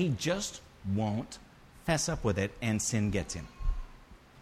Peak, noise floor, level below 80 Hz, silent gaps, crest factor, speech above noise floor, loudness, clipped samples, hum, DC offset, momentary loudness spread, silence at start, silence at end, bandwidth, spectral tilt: -16 dBFS; -54 dBFS; -42 dBFS; none; 16 dB; 22 dB; -33 LUFS; under 0.1%; none; under 0.1%; 13 LU; 0 s; 0 s; 15 kHz; -4.5 dB/octave